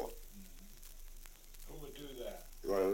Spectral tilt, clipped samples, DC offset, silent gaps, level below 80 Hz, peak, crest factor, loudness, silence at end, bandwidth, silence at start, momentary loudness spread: -4.5 dB/octave; under 0.1%; under 0.1%; none; -52 dBFS; -22 dBFS; 20 dB; -46 LUFS; 0 s; 17 kHz; 0 s; 16 LU